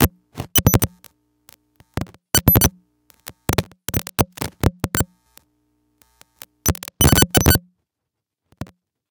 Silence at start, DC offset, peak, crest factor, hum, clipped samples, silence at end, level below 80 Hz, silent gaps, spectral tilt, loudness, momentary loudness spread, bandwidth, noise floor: 0 s; under 0.1%; 0 dBFS; 22 dB; none; under 0.1%; 0.45 s; -34 dBFS; none; -4 dB/octave; -18 LUFS; 22 LU; over 20 kHz; -82 dBFS